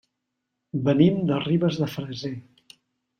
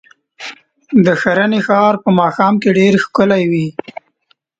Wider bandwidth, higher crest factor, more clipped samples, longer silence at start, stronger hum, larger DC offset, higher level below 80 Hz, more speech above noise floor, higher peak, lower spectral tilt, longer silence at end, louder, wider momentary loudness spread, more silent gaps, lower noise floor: first, 15 kHz vs 7.8 kHz; first, 20 dB vs 14 dB; neither; first, 0.75 s vs 0.4 s; neither; neither; second, -62 dBFS vs -54 dBFS; first, 58 dB vs 48 dB; second, -6 dBFS vs 0 dBFS; about the same, -8 dB/octave vs -7 dB/octave; about the same, 0.8 s vs 0.9 s; second, -24 LUFS vs -13 LUFS; second, 14 LU vs 18 LU; neither; first, -81 dBFS vs -59 dBFS